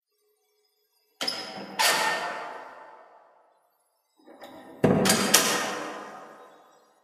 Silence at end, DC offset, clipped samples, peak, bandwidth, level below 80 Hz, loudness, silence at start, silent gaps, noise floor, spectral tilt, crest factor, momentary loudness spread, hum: 0.55 s; under 0.1%; under 0.1%; 0 dBFS; 15.5 kHz; -62 dBFS; -24 LUFS; 1.2 s; none; -72 dBFS; -2.5 dB/octave; 30 dB; 25 LU; none